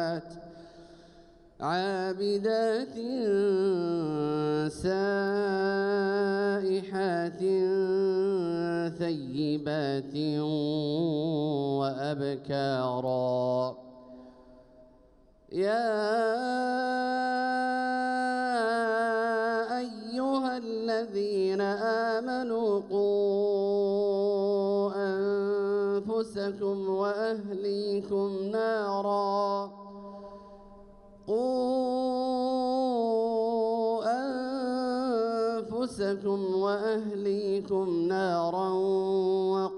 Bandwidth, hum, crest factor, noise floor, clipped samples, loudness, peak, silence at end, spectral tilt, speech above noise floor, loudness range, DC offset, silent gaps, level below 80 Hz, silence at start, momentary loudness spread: 11 kHz; none; 12 dB; -59 dBFS; under 0.1%; -29 LUFS; -16 dBFS; 0 s; -6.5 dB/octave; 31 dB; 4 LU; under 0.1%; none; -66 dBFS; 0 s; 5 LU